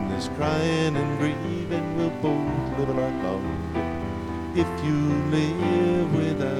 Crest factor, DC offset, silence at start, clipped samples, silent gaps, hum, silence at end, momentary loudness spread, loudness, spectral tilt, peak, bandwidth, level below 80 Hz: 16 dB; under 0.1%; 0 s; under 0.1%; none; none; 0 s; 6 LU; -25 LUFS; -7 dB/octave; -10 dBFS; 12.5 kHz; -44 dBFS